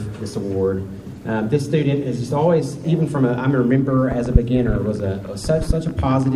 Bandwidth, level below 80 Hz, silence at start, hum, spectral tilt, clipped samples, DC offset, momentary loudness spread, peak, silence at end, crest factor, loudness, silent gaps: 12.5 kHz; -30 dBFS; 0 s; none; -8 dB/octave; under 0.1%; under 0.1%; 8 LU; 0 dBFS; 0 s; 18 dB; -20 LUFS; none